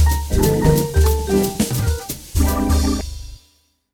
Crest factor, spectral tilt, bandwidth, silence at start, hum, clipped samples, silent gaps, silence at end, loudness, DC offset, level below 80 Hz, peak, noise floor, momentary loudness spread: 16 dB; -5.5 dB/octave; 19 kHz; 0 s; none; under 0.1%; none; 0.6 s; -18 LUFS; under 0.1%; -22 dBFS; -2 dBFS; -59 dBFS; 9 LU